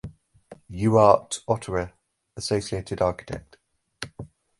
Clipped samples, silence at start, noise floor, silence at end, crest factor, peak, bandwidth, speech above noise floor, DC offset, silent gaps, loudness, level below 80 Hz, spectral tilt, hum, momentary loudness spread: under 0.1%; 0.05 s; -50 dBFS; 0.35 s; 24 dB; -2 dBFS; 11.5 kHz; 27 dB; under 0.1%; none; -23 LUFS; -48 dBFS; -5.5 dB/octave; none; 22 LU